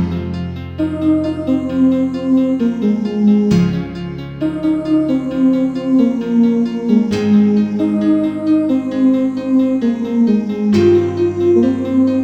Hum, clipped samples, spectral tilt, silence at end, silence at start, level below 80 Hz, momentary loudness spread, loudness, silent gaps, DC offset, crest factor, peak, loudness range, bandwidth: none; under 0.1%; -8.5 dB/octave; 0 s; 0 s; -44 dBFS; 8 LU; -15 LUFS; none; under 0.1%; 12 dB; -2 dBFS; 2 LU; 8.2 kHz